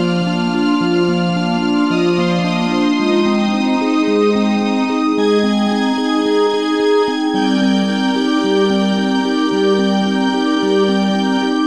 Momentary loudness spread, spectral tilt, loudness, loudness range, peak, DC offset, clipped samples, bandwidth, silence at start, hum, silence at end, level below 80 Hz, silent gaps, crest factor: 2 LU; -6 dB/octave; -15 LUFS; 0 LU; -4 dBFS; 0.4%; under 0.1%; 10.5 kHz; 0 s; none; 0 s; -56 dBFS; none; 12 dB